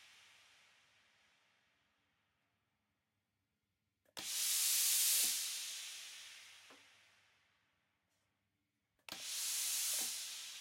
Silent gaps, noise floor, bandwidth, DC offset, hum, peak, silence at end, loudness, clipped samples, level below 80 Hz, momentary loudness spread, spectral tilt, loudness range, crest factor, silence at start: none; -88 dBFS; 16.5 kHz; under 0.1%; none; -20 dBFS; 0 s; -36 LUFS; under 0.1%; under -90 dBFS; 21 LU; 3.5 dB/octave; 17 LU; 22 dB; 0 s